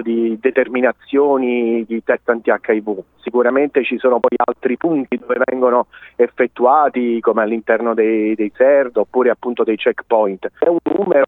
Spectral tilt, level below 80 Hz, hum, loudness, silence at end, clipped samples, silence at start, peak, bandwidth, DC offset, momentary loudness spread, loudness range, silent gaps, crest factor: -8.5 dB/octave; -62 dBFS; none; -16 LUFS; 0 s; under 0.1%; 0 s; 0 dBFS; 4 kHz; under 0.1%; 6 LU; 2 LU; none; 14 dB